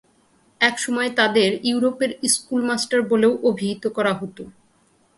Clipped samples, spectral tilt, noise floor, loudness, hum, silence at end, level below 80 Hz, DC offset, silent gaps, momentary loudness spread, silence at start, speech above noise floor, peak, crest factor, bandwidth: under 0.1%; -3 dB/octave; -60 dBFS; -20 LUFS; none; 0.65 s; -64 dBFS; under 0.1%; none; 7 LU; 0.6 s; 40 dB; 0 dBFS; 22 dB; 12 kHz